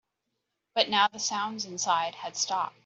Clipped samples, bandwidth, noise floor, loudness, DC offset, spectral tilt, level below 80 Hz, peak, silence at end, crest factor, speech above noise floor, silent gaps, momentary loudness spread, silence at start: under 0.1%; 8.2 kHz; -82 dBFS; -28 LUFS; under 0.1%; -1 dB/octave; -80 dBFS; -6 dBFS; 0.15 s; 24 dB; 53 dB; none; 9 LU; 0.75 s